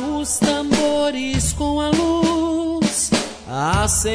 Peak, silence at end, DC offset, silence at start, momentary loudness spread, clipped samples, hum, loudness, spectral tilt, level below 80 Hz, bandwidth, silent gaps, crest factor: -4 dBFS; 0 s; under 0.1%; 0 s; 4 LU; under 0.1%; none; -19 LUFS; -4 dB/octave; -34 dBFS; 11 kHz; none; 16 dB